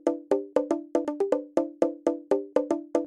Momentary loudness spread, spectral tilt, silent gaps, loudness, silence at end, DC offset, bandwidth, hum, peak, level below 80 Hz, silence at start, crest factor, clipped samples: 3 LU; -6 dB/octave; none; -28 LUFS; 0 s; under 0.1%; 11 kHz; none; -6 dBFS; -72 dBFS; 0.05 s; 20 dB; under 0.1%